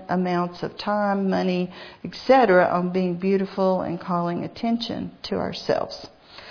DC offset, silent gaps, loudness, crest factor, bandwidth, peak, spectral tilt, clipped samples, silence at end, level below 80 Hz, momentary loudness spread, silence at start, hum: under 0.1%; none; -23 LUFS; 18 dB; 5.4 kHz; -4 dBFS; -7 dB/octave; under 0.1%; 0 s; -58 dBFS; 14 LU; 0 s; none